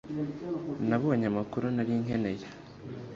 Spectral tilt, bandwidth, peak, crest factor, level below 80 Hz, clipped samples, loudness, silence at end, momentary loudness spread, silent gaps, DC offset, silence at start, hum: -8.5 dB/octave; 7.4 kHz; -14 dBFS; 18 dB; -60 dBFS; under 0.1%; -31 LUFS; 0 s; 16 LU; none; under 0.1%; 0.05 s; none